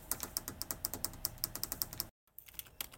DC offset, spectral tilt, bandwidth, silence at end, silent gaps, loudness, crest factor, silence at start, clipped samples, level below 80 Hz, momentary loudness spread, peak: under 0.1%; -1.5 dB/octave; 17 kHz; 0 s; 2.11-2.27 s; -40 LUFS; 30 dB; 0 s; under 0.1%; -58 dBFS; 10 LU; -12 dBFS